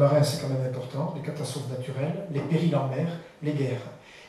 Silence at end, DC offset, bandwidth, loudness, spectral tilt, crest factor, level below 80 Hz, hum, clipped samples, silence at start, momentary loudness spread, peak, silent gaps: 0 s; under 0.1%; 13.5 kHz; -29 LUFS; -7 dB/octave; 18 dB; -66 dBFS; none; under 0.1%; 0 s; 9 LU; -10 dBFS; none